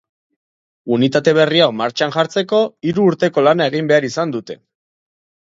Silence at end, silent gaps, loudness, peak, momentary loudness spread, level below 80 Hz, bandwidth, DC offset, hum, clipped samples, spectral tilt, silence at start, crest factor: 0.85 s; none; -15 LUFS; 0 dBFS; 9 LU; -62 dBFS; 7.8 kHz; under 0.1%; none; under 0.1%; -5.5 dB/octave; 0.85 s; 16 dB